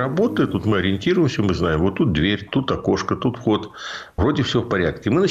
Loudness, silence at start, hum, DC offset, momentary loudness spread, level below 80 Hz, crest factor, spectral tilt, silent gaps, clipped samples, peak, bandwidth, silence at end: -20 LUFS; 0 s; none; under 0.1%; 4 LU; -40 dBFS; 12 dB; -6.5 dB/octave; none; under 0.1%; -8 dBFS; 9.4 kHz; 0 s